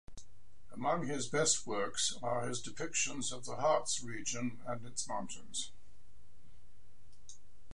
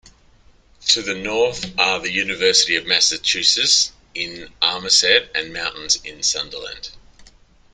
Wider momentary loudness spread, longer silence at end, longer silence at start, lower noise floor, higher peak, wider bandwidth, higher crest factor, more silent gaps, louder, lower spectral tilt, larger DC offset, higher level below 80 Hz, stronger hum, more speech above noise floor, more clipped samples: about the same, 14 LU vs 13 LU; second, 0.4 s vs 0.75 s; second, 0.05 s vs 0.8 s; first, -64 dBFS vs -52 dBFS; second, -16 dBFS vs 0 dBFS; about the same, 11.5 kHz vs 12 kHz; about the same, 22 dB vs 20 dB; neither; second, -36 LUFS vs -17 LUFS; first, -2.5 dB/octave vs 0 dB/octave; first, 1% vs under 0.1%; second, -66 dBFS vs -52 dBFS; neither; second, 27 dB vs 32 dB; neither